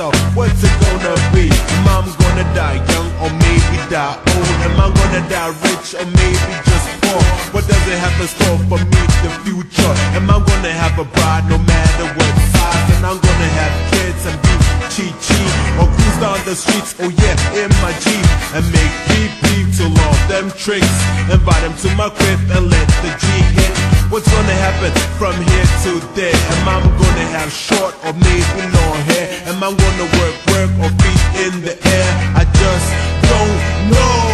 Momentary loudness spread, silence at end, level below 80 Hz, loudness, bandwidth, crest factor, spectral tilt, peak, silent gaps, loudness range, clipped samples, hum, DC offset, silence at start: 5 LU; 0 s; -18 dBFS; -13 LUFS; 13.5 kHz; 12 dB; -5 dB/octave; 0 dBFS; none; 1 LU; under 0.1%; none; under 0.1%; 0 s